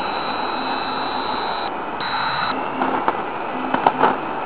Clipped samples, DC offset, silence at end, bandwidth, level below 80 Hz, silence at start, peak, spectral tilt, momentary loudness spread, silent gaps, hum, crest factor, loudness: under 0.1%; 1%; 0 s; 4 kHz; -54 dBFS; 0 s; 0 dBFS; -8 dB/octave; 6 LU; none; none; 22 dB; -22 LUFS